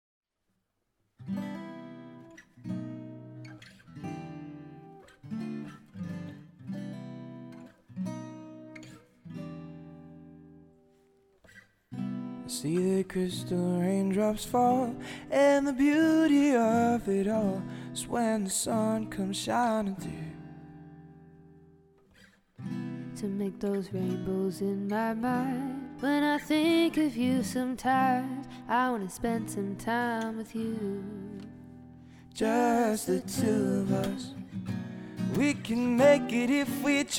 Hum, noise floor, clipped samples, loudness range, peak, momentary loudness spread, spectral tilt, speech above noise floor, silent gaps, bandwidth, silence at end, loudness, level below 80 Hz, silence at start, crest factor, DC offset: none; -79 dBFS; under 0.1%; 17 LU; -10 dBFS; 22 LU; -5.5 dB/octave; 51 dB; none; 17 kHz; 0 s; -29 LUFS; -62 dBFS; 1.2 s; 20 dB; under 0.1%